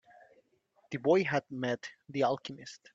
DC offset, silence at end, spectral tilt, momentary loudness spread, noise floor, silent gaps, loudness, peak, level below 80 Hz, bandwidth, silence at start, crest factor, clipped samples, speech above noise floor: under 0.1%; 0.2 s; -6 dB/octave; 15 LU; -71 dBFS; none; -32 LUFS; -14 dBFS; -76 dBFS; 7.8 kHz; 0.9 s; 20 dB; under 0.1%; 39 dB